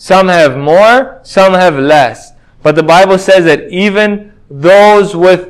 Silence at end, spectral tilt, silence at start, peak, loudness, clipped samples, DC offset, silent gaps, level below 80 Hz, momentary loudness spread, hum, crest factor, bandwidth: 0 s; -5 dB/octave; 0.05 s; 0 dBFS; -7 LUFS; 5%; under 0.1%; none; -44 dBFS; 8 LU; none; 6 dB; 12.5 kHz